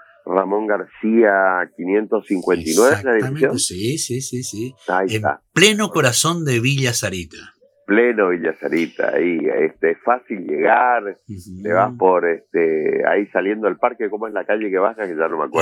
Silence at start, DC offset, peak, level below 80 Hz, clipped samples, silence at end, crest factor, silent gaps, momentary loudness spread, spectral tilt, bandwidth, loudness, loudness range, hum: 0.25 s; under 0.1%; 0 dBFS; -58 dBFS; under 0.1%; 0 s; 18 dB; none; 9 LU; -4 dB/octave; 19.5 kHz; -18 LUFS; 2 LU; none